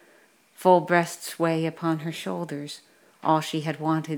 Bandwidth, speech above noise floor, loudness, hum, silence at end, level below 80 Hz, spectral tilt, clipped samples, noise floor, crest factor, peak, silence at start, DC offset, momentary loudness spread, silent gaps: 19.5 kHz; 34 dB; -25 LUFS; none; 0 s; -80 dBFS; -5.5 dB/octave; under 0.1%; -58 dBFS; 20 dB; -4 dBFS; 0.6 s; under 0.1%; 13 LU; none